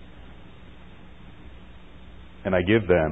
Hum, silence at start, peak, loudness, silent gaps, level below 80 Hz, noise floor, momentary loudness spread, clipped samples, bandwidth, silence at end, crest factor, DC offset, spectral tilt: none; 0.3 s; -6 dBFS; -23 LUFS; none; -44 dBFS; -47 dBFS; 28 LU; under 0.1%; 4 kHz; 0 s; 22 dB; 0.5%; -9.5 dB/octave